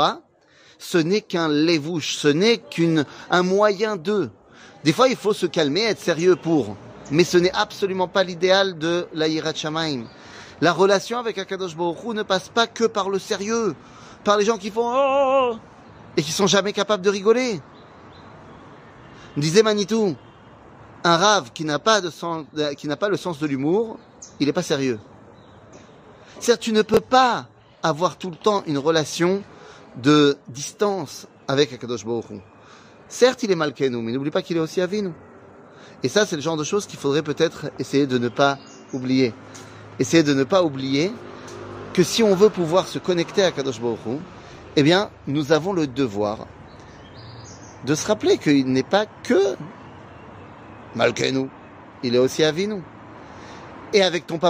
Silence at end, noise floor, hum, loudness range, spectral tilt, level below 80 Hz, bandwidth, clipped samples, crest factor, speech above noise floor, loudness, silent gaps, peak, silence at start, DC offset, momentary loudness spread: 0 s; -53 dBFS; none; 4 LU; -4.5 dB/octave; -60 dBFS; 15.5 kHz; under 0.1%; 20 dB; 33 dB; -21 LUFS; none; -2 dBFS; 0 s; under 0.1%; 19 LU